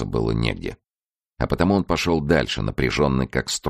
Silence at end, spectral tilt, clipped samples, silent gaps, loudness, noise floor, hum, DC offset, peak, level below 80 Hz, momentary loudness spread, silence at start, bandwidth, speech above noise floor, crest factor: 0 s; -5.5 dB/octave; under 0.1%; 1.04-1.14 s; -22 LUFS; under -90 dBFS; none; under 0.1%; -4 dBFS; -36 dBFS; 7 LU; 0 s; 15 kHz; over 68 dB; 18 dB